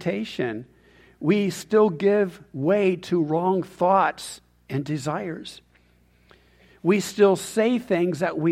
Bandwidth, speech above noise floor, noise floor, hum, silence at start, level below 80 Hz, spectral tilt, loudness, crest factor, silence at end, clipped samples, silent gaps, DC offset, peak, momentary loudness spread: 15.5 kHz; 37 dB; -59 dBFS; 60 Hz at -55 dBFS; 0 s; -62 dBFS; -6 dB/octave; -23 LUFS; 18 dB; 0 s; under 0.1%; none; under 0.1%; -6 dBFS; 12 LU